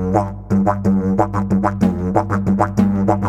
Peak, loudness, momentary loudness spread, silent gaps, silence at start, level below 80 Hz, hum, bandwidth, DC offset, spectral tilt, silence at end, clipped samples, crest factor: -2 dBFS; -17 LUFS; 3 LU; none; 0 s; -36 dBFS; none; 8.6 kHz; under 0.1%; -9 dB/octave; 0 s; under 0.1%; 16 dB